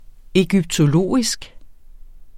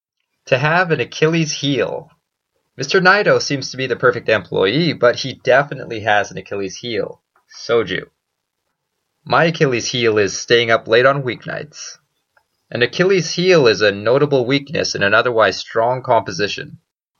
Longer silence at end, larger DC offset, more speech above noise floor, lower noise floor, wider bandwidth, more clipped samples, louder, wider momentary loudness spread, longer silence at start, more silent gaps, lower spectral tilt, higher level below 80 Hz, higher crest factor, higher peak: second, 0 s vs 0.5 s; neither; second, 22 dB vs 59 dB; second, -39 dBFS vs -75 dBFS; first, 15 kHz vs 7.4 kHz; neither; about the same, -18 LUFS vs -16 LUFS; second, 6 LU vs 13 LU; about the same, 0.35 s vs 0.45 s; neither; about the same, -5.5 dB/octave vs -4.5 dB/octave; first, -40 dBFS vs -60 dBFS; about the same, 18 dB vs 18 dB; about the same, -2 dBFS vs 0 dBFS